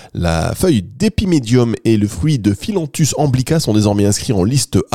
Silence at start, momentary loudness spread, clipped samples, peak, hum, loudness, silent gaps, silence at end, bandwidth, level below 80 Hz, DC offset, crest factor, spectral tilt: 0 s; 4 LU; under 0.1%; -2 dBFS; none; -15 LUFS; none; 0.1 s; 16.5 kHz; -36 dBFS; 0.9%; 14 dB; -5.5 dB/octave